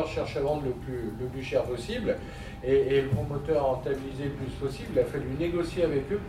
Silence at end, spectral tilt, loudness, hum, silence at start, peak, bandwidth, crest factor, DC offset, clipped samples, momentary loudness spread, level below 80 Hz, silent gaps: 0 s; -7 dB/octave; -29 LUFS; none; 0 s; -14 dBFS; 15 kHz; 16 dB; under 0.1%; under 0.1%; 9 LU; -44 dBFS; none